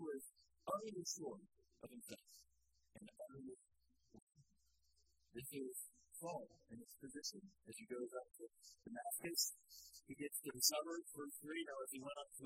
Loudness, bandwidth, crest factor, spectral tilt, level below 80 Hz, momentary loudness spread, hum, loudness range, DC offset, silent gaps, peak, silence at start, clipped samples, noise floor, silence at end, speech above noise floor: -47 LUFS; 16 kHz; 30 dB; -2 dB/octave; -84 dBFS; 19 LU; none; 17 LU; under 0.1%; 4.22-4.27 s; -22 dBFS; 0 s; under 0.1%; -82 dBFS; 0 s; 32 dB